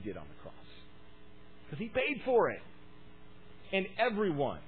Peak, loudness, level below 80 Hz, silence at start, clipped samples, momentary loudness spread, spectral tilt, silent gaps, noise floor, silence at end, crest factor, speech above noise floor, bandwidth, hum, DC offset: -16 dBFS; -33 LUFS; -62 dBFS; 0 s; under 0.1%; 23 LU; -9 dB/octave; none; -57 dBFS; 0 s; 20 dB; 25 dB; 4.6 kHz; none; 0.4%